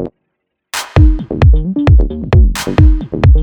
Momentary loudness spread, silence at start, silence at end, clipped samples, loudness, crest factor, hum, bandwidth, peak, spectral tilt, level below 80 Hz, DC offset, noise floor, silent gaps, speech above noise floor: 6 LU; 0 s; 0 s; under 0.1%; -12 LUFS; 10 dB; none; 15.5 kHz; 0 dBFS; -7 dB/octave; -12 dBFS; under 0.1%; -71 dBFS; none; 62 dB